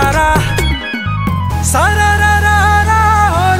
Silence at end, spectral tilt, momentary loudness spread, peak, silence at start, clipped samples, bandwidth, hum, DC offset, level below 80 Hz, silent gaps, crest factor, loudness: 0 s; -4.5 dB/octave; 7 LU; 0 dBFS; 0 s; under 0.1%; 16.5 kHz; none; under 0.1%; -20 dBFS; none; 10 dB; -11 LUFS